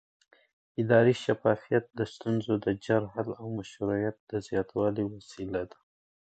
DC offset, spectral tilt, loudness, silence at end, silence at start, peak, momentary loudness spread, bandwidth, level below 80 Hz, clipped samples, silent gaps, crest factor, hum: under 0.1%; -7.5 dB/octave; -30 LUFS; 0.65 s; 0.8 s; -10 dBFS; 13 LU; 8.8 kHz; -60 dBFS; under 0.1%; 4.20-4.27 s; 20 dB; none